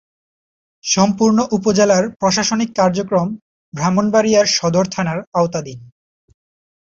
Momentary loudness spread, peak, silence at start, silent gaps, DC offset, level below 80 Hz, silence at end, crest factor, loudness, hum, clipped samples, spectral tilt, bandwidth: 11 LU; -2 dBFS; 0.85 s; 3.42-3.72 s, 5.27-5.32 s; under 0.1%; -54 dBFS; 0.95 s; 16 dB; -16 LUFS; none; under 0.1%; -4.5 dB/octave; 8 kHz